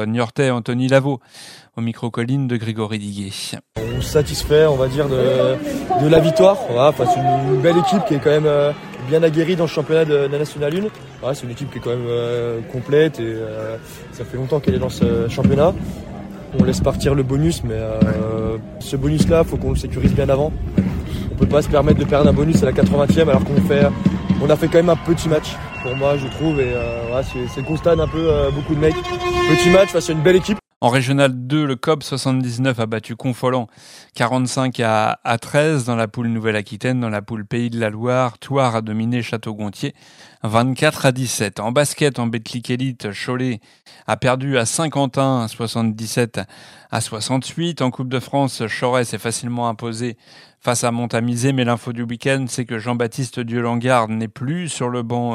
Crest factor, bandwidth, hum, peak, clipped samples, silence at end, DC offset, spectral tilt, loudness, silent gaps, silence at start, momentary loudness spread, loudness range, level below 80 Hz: 18 dB; 16 kHz; none; 0 dBFS; under 0.1%; 0 s; under 0.1%; -6 dB/octave; -18 LUFS; 30.76-30.81 s; 0 s; 11 LU; 6 LU; -36 dBFS